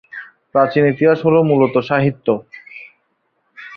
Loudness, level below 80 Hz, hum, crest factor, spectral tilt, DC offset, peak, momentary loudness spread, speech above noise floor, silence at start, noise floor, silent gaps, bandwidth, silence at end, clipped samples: -15 LUFS; -56 dBFS; none; 16 dB; -9.5 dB/octave; under 0.1%; -2 dBFS; 22 LU; 52 dB; 0.15 s; -66 dBFS; none; 5.8 kHz; 0 s; under 0.1%